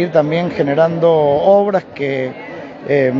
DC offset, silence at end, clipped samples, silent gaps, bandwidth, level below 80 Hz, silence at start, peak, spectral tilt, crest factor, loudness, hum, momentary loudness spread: under 0.1%; 0 s; under 0.1%; none; 7 kHz; -54 dBFS; 0 s; 0 dBFS; -8 dB/octave; 14 dB; -15 LUFS; none; 14 LU